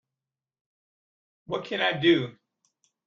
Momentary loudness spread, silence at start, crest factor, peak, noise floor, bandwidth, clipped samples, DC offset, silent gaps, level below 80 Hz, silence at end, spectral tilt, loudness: 13 LU; 1.5 s; 20 dB; -10 dBFS; -90 dBFS; 7 kHz; under 0.1%; under 0.1%; none; -70 dBFS; 0.75 s; -6.5 dB/octave; -25 LUFS